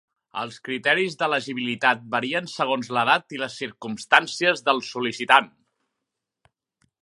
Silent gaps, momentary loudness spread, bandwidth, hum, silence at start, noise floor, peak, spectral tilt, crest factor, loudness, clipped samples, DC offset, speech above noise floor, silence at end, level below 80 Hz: none; 14 LU; 11.5 kHz; none; 0.35 s; -83 dBFS; 0 dBFS; -3.5 dB/octave; 24 dB; -22 LUFS; under 0.1%; under 0.1%; 60 dB; 1.55 s; -74 dBFS